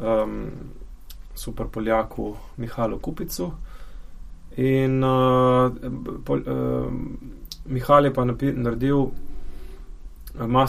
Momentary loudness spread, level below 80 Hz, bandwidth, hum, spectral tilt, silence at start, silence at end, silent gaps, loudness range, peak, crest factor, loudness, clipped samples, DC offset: 24 LU; -38 dBFS; 15.5 kHz; none; -7.5 dB/octave; 0 s; 0 s; none; 7 LU; -2 dBFS; 20 dB; -23 LUFS; under 0.1%; under 0.1%